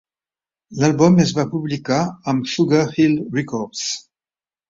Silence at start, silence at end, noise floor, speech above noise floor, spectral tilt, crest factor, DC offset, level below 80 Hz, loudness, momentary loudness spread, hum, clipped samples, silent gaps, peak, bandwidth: 0.7 s; 0.7 s; under -90 dBFS; over 72 dB; -5.5 dB/octave; 18 dB; under 0.1%; -54 dBFS; -18 LUFS; 11 LU; none; under 0.1%; none; -2 dBFS; 7.8 kHz